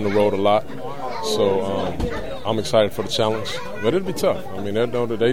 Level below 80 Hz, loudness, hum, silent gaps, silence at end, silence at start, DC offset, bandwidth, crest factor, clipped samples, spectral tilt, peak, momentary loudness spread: -42 dBFS; -22 LUFS; none; none; 0 s; 0 s; 3%; 16.5 kHz; 18 dB; under 0.1%; -5 dB/octave; -2 dBFS; 8 LU